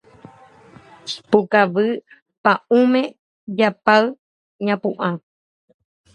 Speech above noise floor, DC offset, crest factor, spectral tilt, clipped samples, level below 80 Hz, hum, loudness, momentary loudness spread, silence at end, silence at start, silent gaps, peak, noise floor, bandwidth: 29 dB; under 0.1%; 20 dB; -6 dB/octave; under 0.1%; -68 dBFS; none; -19 LUFS; 15 LU; 0.95 s; 1.05 s; 2.22-2.26 s, 2.38-2.44 s, 3.19-3.47 s, 4.19-4.59 s; 0 dBFS; -47 dBFS; 9.4 kHz